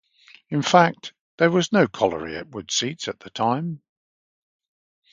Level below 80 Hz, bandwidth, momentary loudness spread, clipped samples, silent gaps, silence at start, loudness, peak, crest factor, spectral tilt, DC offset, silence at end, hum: -60 dBFS; 9.4 kHz; 16 LU; under 0.1%; 1.21-1.38 s; 0.5 s; -22 LUFS; 0 dBFS; 24 dB; -4.5 dB/octave; under 0.1%; 1.35 s; none